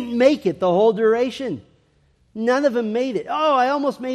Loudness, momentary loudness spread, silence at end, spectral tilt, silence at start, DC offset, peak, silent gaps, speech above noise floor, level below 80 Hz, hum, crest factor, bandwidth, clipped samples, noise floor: -19 LUFS; 11 LU; 0 s; -6 dB/octave; 0 s; under 0.1%; -2 dBFS; none; 41 dB; -62 dBFS; none; 18 dB; 12 kHz; under 0.1%; -60 dBFS